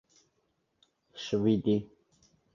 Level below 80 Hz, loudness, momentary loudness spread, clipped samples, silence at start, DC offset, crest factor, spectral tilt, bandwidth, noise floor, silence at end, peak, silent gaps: -64 dBFS; -30 LUFS; 24 LU; under 0.1%; 1.15 s; under 0.1%; 18 dB; -7 dB/octave; 7.4 kHz; -77 dBFS; 0.7 s; -16 dBFS; none